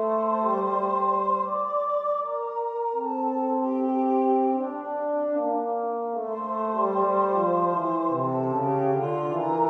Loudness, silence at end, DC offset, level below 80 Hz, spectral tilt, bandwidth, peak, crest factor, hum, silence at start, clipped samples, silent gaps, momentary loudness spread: -26 LUFS; 0 s; under 0.1%; -74 dBFS; -10 dB/octave; 6.2 kHz; -12 dBFS; 14 dB; none; 0 s; under 0.1%; none; 6 LU